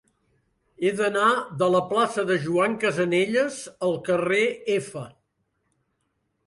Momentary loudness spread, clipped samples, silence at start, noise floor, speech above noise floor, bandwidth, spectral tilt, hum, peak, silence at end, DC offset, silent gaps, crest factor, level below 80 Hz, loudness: 7 LU; under 0.1%; 0.8 s; -74 dBFS; 51 dB; 11.5 kHz; -5 dB/octave; none; -8 dBFS; 1.4 s; under 0.1%; none; 16 dB; -66 dBFS; -23 LUFS